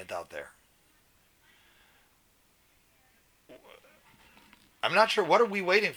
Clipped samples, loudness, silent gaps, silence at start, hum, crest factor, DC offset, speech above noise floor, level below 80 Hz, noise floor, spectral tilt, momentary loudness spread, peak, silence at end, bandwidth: under 0.1%; -26 LUFS; none; 0 s; none; 26 dB; under 0.1%; 39 dB; -74 dBFS; -66 dBFS; -3.5 dB/octave; 20 LU; -6 dBFS; 0 s; over 20 kHz